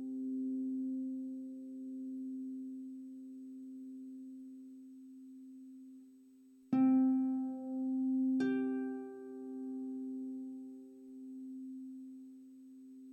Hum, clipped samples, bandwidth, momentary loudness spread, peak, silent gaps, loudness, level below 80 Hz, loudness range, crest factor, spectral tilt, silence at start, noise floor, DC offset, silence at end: none; under 0.1%; 4.6 kHz; 21 LU; -22 dBFS; none; -39 LUFS; under -90 dBFS; 16 LU; 18 dB; -8 dB/octave; 0 s; -61 dBFS; under 0.1%; 0 s